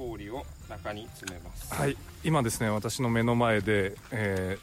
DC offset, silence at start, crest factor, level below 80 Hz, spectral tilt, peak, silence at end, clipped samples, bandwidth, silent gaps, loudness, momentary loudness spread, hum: under 0.1%; 0 s; 16 dB; -48 dBFS; -5.5 dB/octave; -14 dBFS; 0 s; under 0.1%; 16 kHz; none; -29 LUFS; 15 LU; none